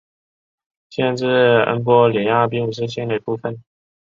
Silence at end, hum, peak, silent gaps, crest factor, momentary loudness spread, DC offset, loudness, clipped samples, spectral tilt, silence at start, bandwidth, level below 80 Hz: 0.55 s; none; -2 dBFS; none; 16 dB; 12 LU; under 0.1%; -17 LUFS; under 0.1%; -7 dB/octave; 0.9 s; 7.4 kHz; -60 dBFS